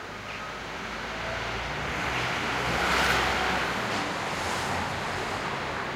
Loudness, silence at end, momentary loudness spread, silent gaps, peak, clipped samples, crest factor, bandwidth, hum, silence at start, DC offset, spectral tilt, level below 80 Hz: -28 LUFS; 0 s; 11 LU; none; -10 dBFS; under 0.1%; 18 dB; 16.5 kHz; none; 0 s; under 0.1%; -3.5 dB/octave; -46 dBFS